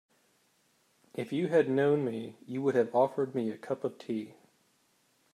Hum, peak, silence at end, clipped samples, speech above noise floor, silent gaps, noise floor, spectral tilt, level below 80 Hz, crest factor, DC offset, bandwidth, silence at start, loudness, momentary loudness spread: none; -14 dBFS; 1 s; under 0.1%; 41 dB; none; -71 dBFS; -7.5 dB/octave; -82 dBFS; 18 dB; under 0.1%; 13 kHz; 1.15 s; -31 LUFS; 13 LU